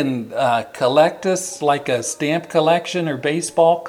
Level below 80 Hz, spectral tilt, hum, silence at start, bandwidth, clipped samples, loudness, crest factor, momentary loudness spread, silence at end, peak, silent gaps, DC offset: -68 dBFS; -4.5 dB/octave; none; 0 s; 16 kHz; under 0.1%; -19 LUFS; 16 dB; 6 LU; 0 s; -2 dBFS; none; under 0.1%